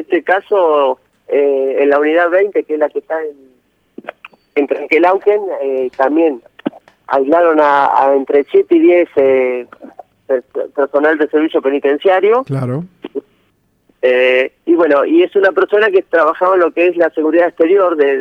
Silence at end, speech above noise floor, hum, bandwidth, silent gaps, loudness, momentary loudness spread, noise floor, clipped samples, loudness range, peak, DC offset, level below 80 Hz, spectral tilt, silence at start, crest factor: 0 s; 47 dB; none; 5.6 kHz; none; -13 LUFS; 12 LU; -59 dBFS; under 0.1%; 4 LU; 0 dBFS; under 0.1%; -66 dBFS; -7.5 dB/octave; 0 s; 12 dB